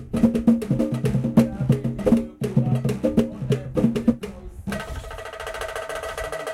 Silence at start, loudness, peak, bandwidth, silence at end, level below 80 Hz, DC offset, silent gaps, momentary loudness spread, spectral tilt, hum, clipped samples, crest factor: 0 s; -23 LUFS; -4 dBFS; 13.5 kHz; 0 s; -40 dBFS; under 0.1%; none; 12 LU; -7.5 dB/octave; none; under 0.1%; 18 dB